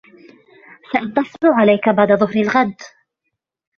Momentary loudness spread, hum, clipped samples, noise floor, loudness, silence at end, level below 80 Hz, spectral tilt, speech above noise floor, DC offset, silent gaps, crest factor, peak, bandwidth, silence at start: 9 LU; none; under 0.1%; -76 dBFS; -16 LUFS; 0.9 s; -58 dBFS; -7 dB/octave; 61 dB; under 0.1%; none; 18 dB; 0 dBFS; 7 kHz; 0.9 s